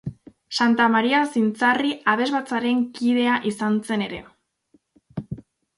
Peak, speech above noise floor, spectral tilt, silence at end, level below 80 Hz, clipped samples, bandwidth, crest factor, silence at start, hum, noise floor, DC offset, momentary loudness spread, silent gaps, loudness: -4 dBFS; 42 dB; -5 dB/octave; 0.4 s; -58 dBFS; under 0.1%; 11.5 kHz; 18 dB; 0.05 s; none; -63 dBFS; under 0.1%; 18 LU; none; -21 LUFS